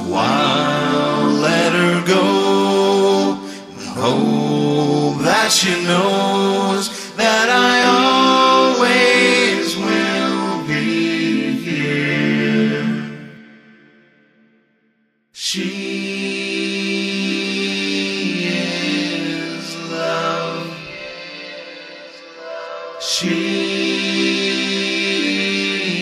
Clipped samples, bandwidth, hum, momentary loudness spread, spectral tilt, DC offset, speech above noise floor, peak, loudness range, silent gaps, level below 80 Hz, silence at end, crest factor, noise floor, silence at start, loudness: under 0.1%; 15.5 kHz; none; 16 LU; -4 dB/octave; under 0.1%; 47 dB; -2 dBFS; 11 LU; none; -60 dBFS; 0 s; 16 dB; -62 dBFS; 0 s; -16 LUFS